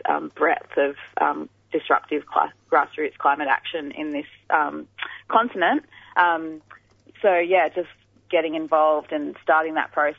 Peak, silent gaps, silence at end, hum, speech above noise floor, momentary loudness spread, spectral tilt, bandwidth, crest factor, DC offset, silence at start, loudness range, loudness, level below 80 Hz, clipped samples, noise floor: -2 dBFS; none; 0.05 s; none; 28 dB; 11 LU; -6 dB/octave; 6.4 kHz; 20 dB; under 0.1%; 0.05 s; 2 LU; -23 LUFS; -70 dBFS; under 0.1%; -51 dBFS